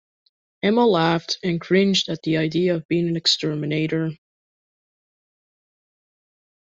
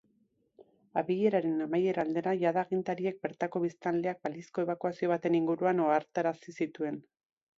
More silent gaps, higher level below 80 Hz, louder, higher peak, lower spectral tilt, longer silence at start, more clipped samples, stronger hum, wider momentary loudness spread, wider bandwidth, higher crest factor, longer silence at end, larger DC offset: first, 2.85-2.89 s vs none; first, -62 dBFS vs -78 dBFS; first, -21 LUFS vs -32 LUFS; first, -6 dBFS vs -14 dBFS; second, -5 dB/octave vs -7.5 dB/octave; about the same, 0.65 s vs 0.6 s; neither; neither; about the same, 7 LU vs 8 LU; about the same, 8 kHz vs 7.4 kHz; about the same, 18 dB vs 18 dB; first, 2.5 s vs 0.55 s; neither